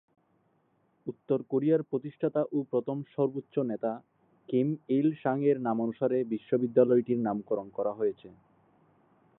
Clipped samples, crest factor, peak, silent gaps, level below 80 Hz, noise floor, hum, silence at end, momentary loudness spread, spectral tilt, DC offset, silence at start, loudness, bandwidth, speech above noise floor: under 0.1%; 20 dB; -10 dBFS; none; -78 dBFS; -71 dBFS; none; 1.1 s; 9 LU; -12 dB/octave; under 0.1%; 1.05 s; -30 LUFS; 4 kHz; 42 dB